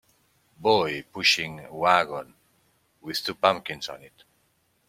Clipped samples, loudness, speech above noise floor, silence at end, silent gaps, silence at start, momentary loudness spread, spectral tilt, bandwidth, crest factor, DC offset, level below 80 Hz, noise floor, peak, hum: under 0.1%; -24 LUFS; 43 dB; 0.8 s; none; 0.6 s; 15 LU; -3 dB/octave; 16.5 kHz; 24 dB; under 0.1%; -66 dBFS; -69 dBFS; -2 dBFS; none